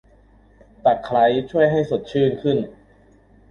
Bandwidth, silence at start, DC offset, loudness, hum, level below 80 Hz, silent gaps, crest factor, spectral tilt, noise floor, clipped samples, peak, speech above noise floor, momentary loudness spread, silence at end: 7 kHz; 0.85 s; under 0.1%; -20 LUFS; none; -52 dBFS; none; 16 dB; -8 dB/octave; -53 dBFS; under 0.1%; -4 dBFS; 34 dB; 5 LU; 0.8 s